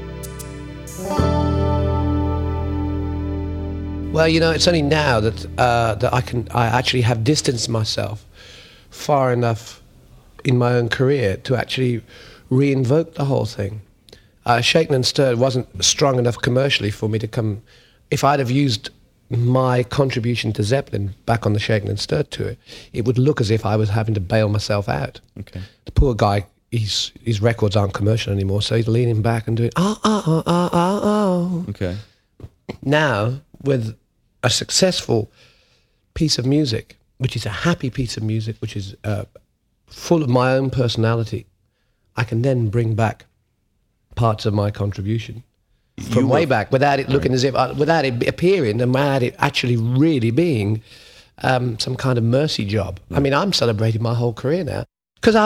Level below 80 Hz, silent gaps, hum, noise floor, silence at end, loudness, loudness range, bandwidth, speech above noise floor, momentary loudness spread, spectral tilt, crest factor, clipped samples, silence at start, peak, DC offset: -36 dBFS; none; none; -66 dBFS; 0 s; -19 LUFS; 4 LU; 15 kHz; 47 dB; 11 LU; -5.5 dB/octave; 18 dB; under 0.1%; 0 s; -2 dBFS; under 0.1%